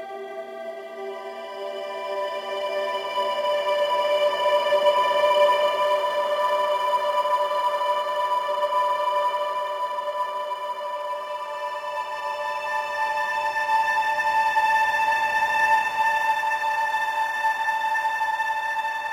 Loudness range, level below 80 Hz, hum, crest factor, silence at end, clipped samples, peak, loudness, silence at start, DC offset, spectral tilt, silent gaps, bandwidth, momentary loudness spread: 7 LU; -70 dBFS; none; 16 dB; 0 s; under 0.1%; -8 dBFS; -23 LUFS; 0 s; under 0.1%; -1 dB/octave; none; 16 kHz; 11 LU